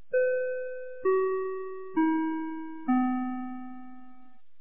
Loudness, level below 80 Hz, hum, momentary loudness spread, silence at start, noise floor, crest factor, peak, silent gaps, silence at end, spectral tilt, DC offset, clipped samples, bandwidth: -30 LUFS; -68 dBFS; none; 13 LU; 0.1 s; -59 dBFS; 14 dB; -16 dBFS; none; 0.5 s; -5 dB/octave; 0.8%; under 0.1%; 3.5 kHz